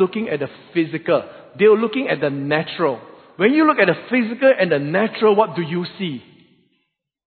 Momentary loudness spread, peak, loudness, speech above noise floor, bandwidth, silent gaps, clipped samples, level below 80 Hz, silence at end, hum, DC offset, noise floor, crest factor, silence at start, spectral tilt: 11 LU; -2 dBFS; -18 LUFS; 55 dB; 4.6 kHz; none; under 0.1%; -66 dBFS; 1.05 s; none; under 0.1%; -73 dBFS; 18 dB; 0 s; -11 dB/octave